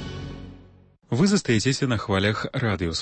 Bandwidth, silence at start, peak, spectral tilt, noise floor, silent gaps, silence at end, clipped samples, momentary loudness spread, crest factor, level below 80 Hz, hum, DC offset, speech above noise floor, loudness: 8.8 kHz; 0 s; -10 dBFS; -5 dB/octave; -53 dBFS; none; 0 s; under 0.1%; 17 LU; 16 dB; -46 dBFS; none; under 0.1%; 30 dB; -23 LUFS